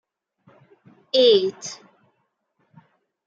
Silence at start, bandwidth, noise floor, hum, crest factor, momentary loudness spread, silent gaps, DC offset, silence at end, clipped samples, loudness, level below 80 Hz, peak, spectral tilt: 1.15 s; 7.8 kHz; -72 dBFS; none; 20 dB; 20 LU; none; under 0.1%; 1.5 s; under 0.1%; -18 LUFS; -78 dBFS; -6 dBFS; -3 dB/octave